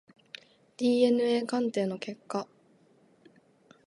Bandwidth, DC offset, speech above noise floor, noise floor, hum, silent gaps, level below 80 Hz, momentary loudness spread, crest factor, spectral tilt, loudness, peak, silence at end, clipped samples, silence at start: 11.5 kHz; under 0.1%; 35 dB; -63 dBFS; none; none; -82 dBFS; 24 LU; 18 dB; -5.5 dB/octave; -29 LUFS; -12 dBFS; 1.45 s; under 0.1%; 0.8 s